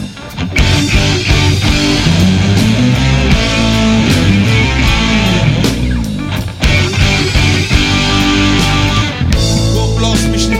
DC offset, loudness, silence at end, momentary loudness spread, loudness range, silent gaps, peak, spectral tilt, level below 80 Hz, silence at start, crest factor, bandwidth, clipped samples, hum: under 0.1%; -11 LUFS; 0 s; 4 LU; 1 LU; none; 0 dBFS; -5 dB/octave; -18 dBFS; 0 s; 10 dB; 16 kHz; under 0.1%; none